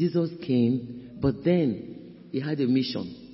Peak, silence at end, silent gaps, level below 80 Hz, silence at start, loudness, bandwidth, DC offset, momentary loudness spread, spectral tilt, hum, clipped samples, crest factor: -10 dBFS; 0 s; none; -54 dBFS; 0 s; -27 LUFS; 5.8 kHz; under 0.1%; 13 LU; -11 dB/octave; none; under 0.1%; 16 dB